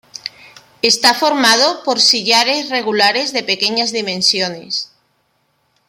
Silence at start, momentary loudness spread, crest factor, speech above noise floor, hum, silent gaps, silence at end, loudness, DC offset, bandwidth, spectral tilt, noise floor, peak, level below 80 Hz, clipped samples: 0.15 s; 11 LU; 16 dB; 48 dB; none; none; 1.05 s; -13 LUFS; under 0.1%; 16.5 kHz; -1 dB/octave; -63 dBFS; 0 dBFS; -64 dBFS; under 0.1%